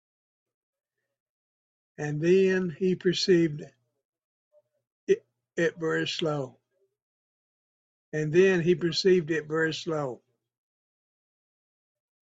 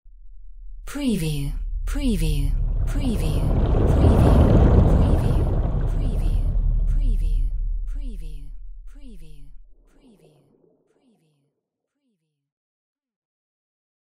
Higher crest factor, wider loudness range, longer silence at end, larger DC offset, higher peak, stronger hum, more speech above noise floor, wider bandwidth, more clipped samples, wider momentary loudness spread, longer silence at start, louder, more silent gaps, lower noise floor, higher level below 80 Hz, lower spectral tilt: about the same, 20 dB vs 18 dB; second, 5 LU vs 14 LU; first, 2.05 s vs 0.9 s; second, under 0.1% vs 0.8%; second, -10 dBFS vs -4 dBFS; neither; first, over 65 dB vs 59 dB; second, 8 kHz vs 14 kHz; neither; second, 14 LU vs 19 LU; first, 2 s vs 0.05 s; second, -26 LUFS vs -22 LUFS; first, 4.05-4.13 s, 4.24-4.51 s, 4.92-5.07 s, 7.02-8.12 s vs 12.52-12.95 s; first, under -90 dBFS vs -80 dBFS; second, -70 dBFS vs -24 dBFS; second, -5.5 dB/octave vs -8 dB/octave